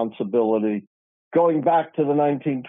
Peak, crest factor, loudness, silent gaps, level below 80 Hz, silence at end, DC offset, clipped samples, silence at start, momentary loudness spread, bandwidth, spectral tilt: -6 dBFS; 14 dB; -21 LUFS; 0.87-1.31 s; -74 dBFS; 0 s; under 0.1%; under 0.1%; 0 s; 6 LU; 3.8 kHz; -10.5 dB/octave